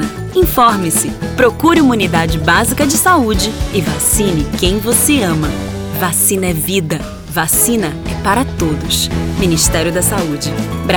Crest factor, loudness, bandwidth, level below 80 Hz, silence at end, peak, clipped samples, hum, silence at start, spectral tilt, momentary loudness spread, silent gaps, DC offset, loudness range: 14 dB; -13 LUFS; over 20 kHz; -28 dBFS; 0 s; 0 dBFS; under 0.1%; none; 0 s; -4 dB/octave; 8 LU; none; under 0.1%; 3 LU